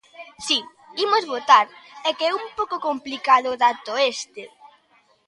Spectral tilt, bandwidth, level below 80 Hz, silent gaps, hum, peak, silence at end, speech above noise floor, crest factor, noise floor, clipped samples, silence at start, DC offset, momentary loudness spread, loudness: -0.5 dB/octave; 11.5 kHz; -70 dBFS; none; none; 0 dBFS; 0.8 s; 39 dB; 22 dB; -60 dBFS; under 0.1%; 0.2 s; under 0.1%; 15 LU; -21 LUFS